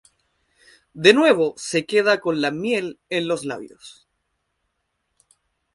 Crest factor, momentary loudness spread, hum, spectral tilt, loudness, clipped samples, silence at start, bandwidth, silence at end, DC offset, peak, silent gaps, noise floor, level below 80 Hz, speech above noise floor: 22 dB; 12 LU; none; -4 dB/octave; -20 LUFS; under 0.1%; 0.95 s; 11.5 kHz; 1.85 s; under 0.1%; 0 dBFS; none; -75 dBFS; -66 dBFS; 55 dB